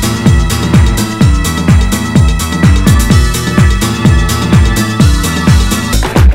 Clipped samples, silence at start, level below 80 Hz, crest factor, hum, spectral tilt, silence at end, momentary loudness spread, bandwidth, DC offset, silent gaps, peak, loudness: 3%; 0 s; -12 dBFS; 8 dB; none; -5.5 dB/octave; 0 s; 3 LU; 16.5 kHz; under 0.1%; none; 0 dBFS; -9 LUFS